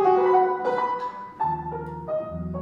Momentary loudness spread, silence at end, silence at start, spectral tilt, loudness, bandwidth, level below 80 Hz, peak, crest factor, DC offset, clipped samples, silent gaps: 14 LU; 0 s; 0 s; -8.5 dB/octave; -25 LUFS; 6.4 kHz; -50 dBFS; -8 dBFS; 16 dB; under 0.1%; under 0.1%; none